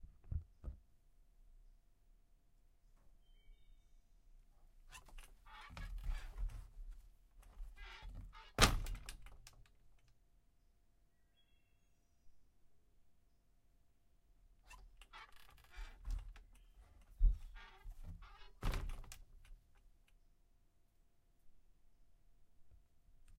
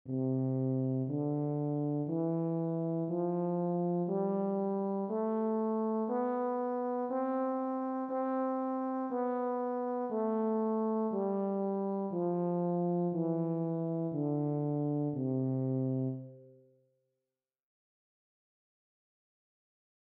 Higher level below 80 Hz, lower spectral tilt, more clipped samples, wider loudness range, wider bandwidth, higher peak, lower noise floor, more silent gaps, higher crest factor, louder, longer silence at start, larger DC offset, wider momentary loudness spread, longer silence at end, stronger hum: first, -48 dBFS vs -88 dBFS; second, -3 dB/octave vs -13 dB/octave; neither; first, 23 LU vs 3 LU; first, 16 kHz vs 2.8 kHz; first, -8 dBFS vs -24 dBFS; second, -73 dBFS vs under -90 dBFS; neither; first, 38 dB vs 10 dB; second, -43 LUFS vs -34 LUFS; about the same, 0 s vs 0.05 s; neither; first, 22 LU vs 2 LU; second, 0 s vs 3.5 s; neither